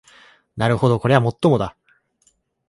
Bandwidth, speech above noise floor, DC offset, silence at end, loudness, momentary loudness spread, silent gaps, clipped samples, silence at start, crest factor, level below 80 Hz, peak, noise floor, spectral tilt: 11.5 kHz; 46 dB; under 0.1%; 1 s; -19 LUFS; 11 LU; none; under 0.1%; 0.55 s; 20 dB; -50 dBFS; 0 dBFS; -63 dBFS; -7.5 dB/octave